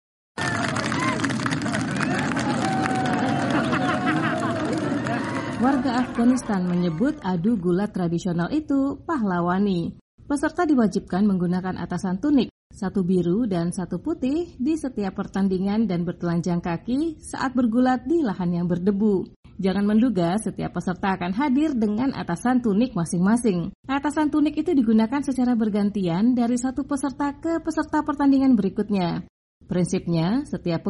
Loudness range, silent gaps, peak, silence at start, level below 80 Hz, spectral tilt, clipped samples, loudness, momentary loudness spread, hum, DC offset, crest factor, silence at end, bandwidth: 2 LU; 10.01-10.18 s, 12.51-12.70 s, 19.36-19.43 s, 23.75-23.83 s, 29.29-29.61 s; -6 dBFS; 0.35 s; -50 dBFS; -6.5 dB/octave; under 0.1%; -23 LUFS; 7 LU; none; under 0.1%; 16 dB; 0 s; 11.5 kHz